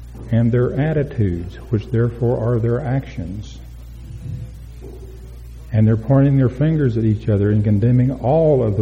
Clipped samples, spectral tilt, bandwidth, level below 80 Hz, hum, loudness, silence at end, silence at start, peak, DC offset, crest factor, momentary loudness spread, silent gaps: under 0.1%; -10 dB/octave; 6.6 kHz; -36 dBFS; none; -18 LUFS; 0 s; 0 s; -4 dBFS; under 0.1%; 14 dB; 22 LU; none